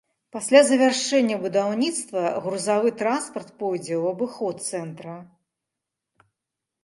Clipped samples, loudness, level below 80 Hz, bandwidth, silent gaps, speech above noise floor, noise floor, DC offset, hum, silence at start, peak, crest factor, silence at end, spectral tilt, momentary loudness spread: under 0.1%; -23 LUFS; -76 dBFS; 11.5 kHz; none; 62 dB; -85 dBFS; under 0.1%; none; 0.35 s; -2 dBFS; 22 dB; 1.6 s; -3.5 dB/octave; 16 LU